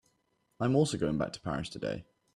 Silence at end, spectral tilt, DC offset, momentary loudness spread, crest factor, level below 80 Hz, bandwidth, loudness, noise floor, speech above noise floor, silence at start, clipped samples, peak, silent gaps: 0.35 s; -6 dB/octave; under 0.1%; 10 LU; 18 dB; -58 dBFS; 12 kHz; -32 LUFS; -75 dBFS; 44 dB; 0.6 s; under 0.1%; -14 dBFS; none